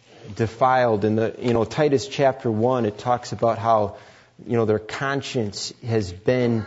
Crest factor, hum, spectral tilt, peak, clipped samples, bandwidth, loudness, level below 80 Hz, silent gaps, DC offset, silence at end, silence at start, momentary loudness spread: 16 dB; none; -6 dB/octave; -6 dBFS; under 0.1%; 8 kHz; -22 LUFS; -56 dBFS; none; under 0.1%; 0 s; 0.2 s; 8 LU